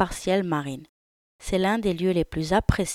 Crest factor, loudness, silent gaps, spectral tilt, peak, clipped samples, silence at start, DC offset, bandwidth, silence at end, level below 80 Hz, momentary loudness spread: 20 dB; -25 LUFS; 0.89-1.39 s; -5.5 dB/octave; -4 dBFS; under 0.1%; 0 s; under 0.1%; 15.5 kHz; 0 s; -38 dBFS; 12 LU